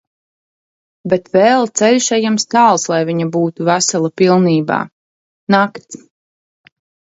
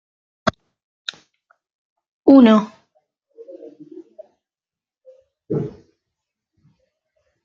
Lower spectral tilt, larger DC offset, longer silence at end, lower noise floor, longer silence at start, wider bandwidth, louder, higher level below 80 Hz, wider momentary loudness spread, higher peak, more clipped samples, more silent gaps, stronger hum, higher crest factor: second, -4.5 dB/octave vs -7 dB/octave; neither; second, 1.15 s vs 1.75 s; about the same, under -90 dBFS vs under -90 dBFS; first, 1.05 s vs 0.45 s; first, 8 kHz vs 7.2 kHz; about the same, -14 LUFS vs -16 LUFS; about the same, -60 dBFS vs -60 dBFS; second, 9 LU vs 29 LU; about the same, 0 dBFS vs -2 dBFS; neither; about the same, 4.92-5.47 s vs 0.83-1.05 s, 1.74-1.96 s, 2.08-2.23 s; neither; about the same, 16 dB vs 20 dB